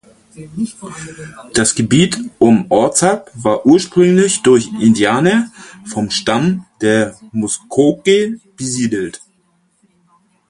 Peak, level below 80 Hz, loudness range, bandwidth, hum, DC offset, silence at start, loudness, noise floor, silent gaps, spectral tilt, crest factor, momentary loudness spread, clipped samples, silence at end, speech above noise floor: 0 dBFS; -50 dBFS; 5 LU; 11.5 kHz; none; under 0.1%; 0.35 s; -14 LUFS; -59 dBFS; none; -4.5 dB/octave; 14 dB; 14 LU; under 0.1%; 1.35 s; 45 dB